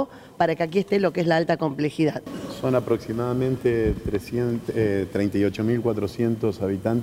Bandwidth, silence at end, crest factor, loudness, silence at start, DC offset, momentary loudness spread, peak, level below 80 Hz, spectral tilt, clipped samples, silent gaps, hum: 16 kHz; 0 s; 18 dB; -24 LUFS; 0 s; under 0.1%; 4 LU; -6 dBFS; -44 dBFS; -7.5 dB/octave; under 0.1%; none; none